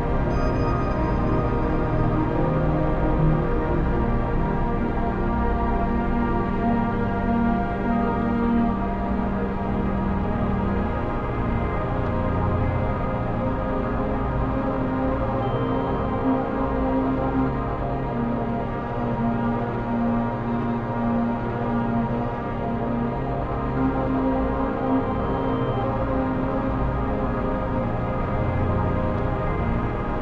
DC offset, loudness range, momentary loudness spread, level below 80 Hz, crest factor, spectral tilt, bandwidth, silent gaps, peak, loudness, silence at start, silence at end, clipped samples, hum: under 0.1%; 2 LU; 3 LU; -30 dBFS; 14 dB; -10 dB/octave; 6.6 kHz; none; -8 dBFS; -24 LUFS; 0 s; 0 s; under 0.1%; none